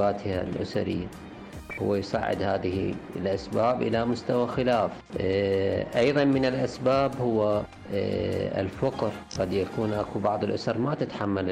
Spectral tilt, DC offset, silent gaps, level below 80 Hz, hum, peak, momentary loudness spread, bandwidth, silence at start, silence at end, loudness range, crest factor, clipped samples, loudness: -7 dB/octave; under 0.1%; none; -52 dBFS; none; -14 dBFS; 7 LU; 14 kHz; 0 s; 0 s; 4 LU; 14 dB; under 0.1%; -27 LUFS